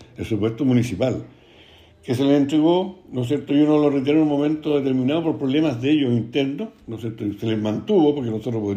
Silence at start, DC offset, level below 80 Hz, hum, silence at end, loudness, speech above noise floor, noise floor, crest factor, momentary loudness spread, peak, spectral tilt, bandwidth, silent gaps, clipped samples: 0 s; under 0.1%; -56 dBFS; none; 0 s; -21 LUFS; 29 dB; -49 dBFS; 14 dB; 10 LU; -6 dBFS; -7.5 dB/octave; 9.6 kHz; none; under 0.1%